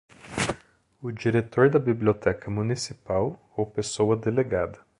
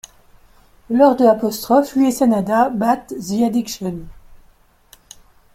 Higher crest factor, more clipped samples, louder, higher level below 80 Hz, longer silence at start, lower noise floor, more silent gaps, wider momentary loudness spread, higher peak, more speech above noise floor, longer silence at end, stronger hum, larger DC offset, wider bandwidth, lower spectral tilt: about the same, 20 dB vs 16 dB; neither; second, -26 LUFS vs -17 LUFS; about the same, -52 dBFS vs -50 dBFS; second, 0.25 s vs 0.9 s; about the same, -50 dBFS vs -52 dBFS; neither; about the same, 11 LU vs 12 LU; second, -6 dBFS vs -2 dBFS; second, 25 dB vs 36 dB; second, 0.25 s vs 1.2 s; neither; neither; second, 11.5 kHz vs 16.5 kHz; about the same, -6 dB/octave vs -5.5 dB/octave